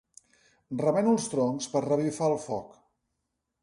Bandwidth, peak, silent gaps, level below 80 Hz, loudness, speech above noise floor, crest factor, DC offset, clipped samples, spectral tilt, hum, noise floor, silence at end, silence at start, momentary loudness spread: 11.5 kHz; -12 dBFS; none; -68 dBFS; -28 LUFS; 55 dB; 16 dB; under 0.1%; under 0.1%; -6 dB/octave; none; -82 dBFS; 0.95 s; 0.7 s; 11 LU